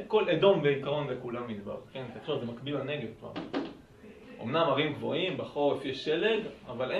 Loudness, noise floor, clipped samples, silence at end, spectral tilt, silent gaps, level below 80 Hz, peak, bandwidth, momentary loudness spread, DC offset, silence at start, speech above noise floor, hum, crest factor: -31 LUFS; -52 dBFS; under 0.1%; 0 s; -7 dB/octave; none; -66 dBFS; -10 dBFS; 10.5 kHz; 16 LU; under 0.1%; 0 s; 21 dB; none; 22 dB